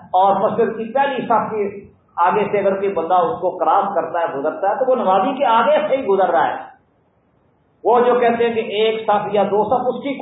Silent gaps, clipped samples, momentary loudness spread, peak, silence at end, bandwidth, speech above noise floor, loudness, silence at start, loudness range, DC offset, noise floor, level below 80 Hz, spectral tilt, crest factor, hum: none; under 0.1%; 7 LU; -4 dBFS; 0 s; 4 kHz; 42 dB; -17 LUFS; 0 s; 2 LU; under 0.1%; -59 dBFS; -62 dBFS; -10.5 dB/octave; 14 dB; none